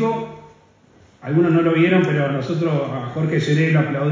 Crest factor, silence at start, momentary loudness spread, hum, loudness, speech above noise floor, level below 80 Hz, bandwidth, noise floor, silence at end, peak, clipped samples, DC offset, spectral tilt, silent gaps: 14 dB; 0 s; 10 LU; none; -19 LUFS; 34 dB; -60 dBFS; 7.6 kHz; -52 dBFS; 0 s; -4 dBFS; under 0.1%; under 0.1%; -8 dB/octave; none